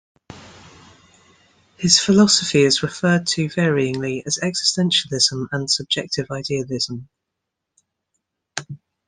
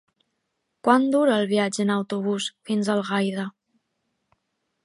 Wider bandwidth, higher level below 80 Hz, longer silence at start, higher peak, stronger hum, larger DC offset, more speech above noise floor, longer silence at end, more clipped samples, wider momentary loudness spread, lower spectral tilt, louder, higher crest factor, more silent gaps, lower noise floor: about the same, 10.5 kHz vs 11.5 kHz; first, -56 dBFS vs -76 dBFS; second, 0.3 s vs 0.85 s; about the same, 0 dBFS vs -2 dBFS; neither; neither; first, 62 dB vs 55 dB; second, 0.3 s vs 1.35 s; neither; first, 13 LU vs 8 LU; second, -3.5 dB/octave vs -5 dB/octave; first, -18 LUFS vs -23 LUFS; about the same, 22 dB vs 22 dB; neither; first, -81 dBFS vs -77 dBFS